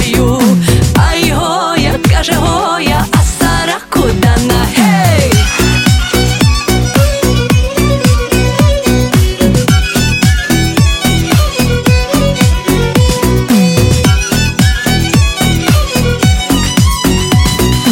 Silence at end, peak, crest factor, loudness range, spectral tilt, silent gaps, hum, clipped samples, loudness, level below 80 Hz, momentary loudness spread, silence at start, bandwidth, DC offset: 0 s; 0 dBFS; 10 dB; 1 LU; -5 dB/octave; none; none; under 0.1%; -10 LUFS; -18 dBFS; 3 LU; 0 s; 17.5 kHz; under 0.1%